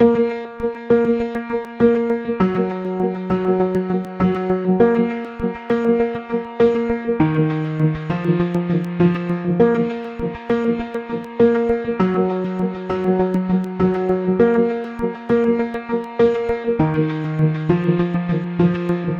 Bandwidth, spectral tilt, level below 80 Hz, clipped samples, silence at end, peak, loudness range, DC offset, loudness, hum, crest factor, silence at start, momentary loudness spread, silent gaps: 7.2 kHz; -9.5 dB/octave; -46 dBFS; under 0.1%; 0 s; -2 dBFS; 1 LU; under 0.1%; -19 LUFS; none; 16 dB; 0 s; 8 LU; none